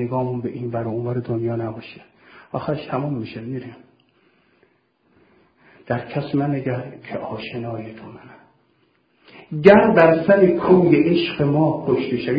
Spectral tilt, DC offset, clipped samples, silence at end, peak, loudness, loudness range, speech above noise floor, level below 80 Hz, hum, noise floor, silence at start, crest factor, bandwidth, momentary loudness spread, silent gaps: -9.5 dB/octave; under 0.1%; under 0.1%; 0 s; 0 dBFS; -19 LUFS; 15 LU; 44 dB; -54 dBFS; none; -63 dBFS; 0 s; 20 dB; 5.2 kHz; 18 LU; none